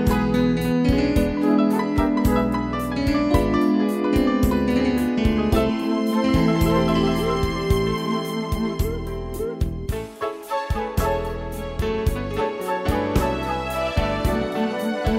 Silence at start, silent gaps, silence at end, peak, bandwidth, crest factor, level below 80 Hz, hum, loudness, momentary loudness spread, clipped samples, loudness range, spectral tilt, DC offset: 0 s; none; 0 s; -4 dBFS; 16 kHz; 16 dB; -30 dBFS; none; -22 LUFS; 8 LU; under 0.1%; 6 LU; -6.5 dB/octave; under 0.1%